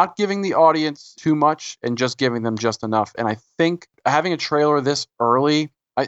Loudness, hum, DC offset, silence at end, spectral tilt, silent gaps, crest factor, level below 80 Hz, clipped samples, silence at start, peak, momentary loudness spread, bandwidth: -20 LUFS; none; under 0.1%; 0 s; -5 dB/octave; none; 18 dB; -66 dBFS; under 0.1%; 0 s; -2 dBFS; 9 LU; 8.2 kHz